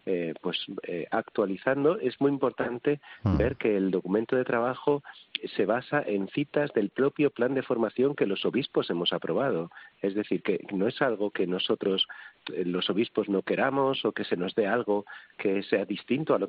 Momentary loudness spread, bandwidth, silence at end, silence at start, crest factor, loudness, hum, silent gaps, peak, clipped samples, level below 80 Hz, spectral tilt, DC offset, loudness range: 6 LU; 5.2 kHz; 0 s; 0.05 s; 18 dB; -28 LUFS; none; none; -10 dBFS; under 0.1%; -54 dBFS; -4 dB/octave; under 0.1%; 1 LU